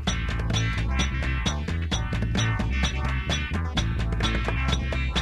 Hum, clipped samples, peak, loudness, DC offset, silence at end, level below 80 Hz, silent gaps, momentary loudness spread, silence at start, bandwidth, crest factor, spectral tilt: none; under 0.1%; -10 dBFS; -26 LUFS; under 0.1%; 0 s; -28 dBFS; none; 2 LU; 0 s; 11.5 kHz; 16 dB; -4.5 dB/octave